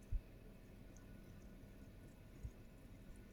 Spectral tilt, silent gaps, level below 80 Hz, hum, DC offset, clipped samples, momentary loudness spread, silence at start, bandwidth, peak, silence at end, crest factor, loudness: -6.5 dB/octave; none; -56 dBFS; none; under 0.1%; under 0.1%; 7 LU; 0 s; over 20 kHz; -32 dBFS; 0 s; 22 dB; -59 LUFS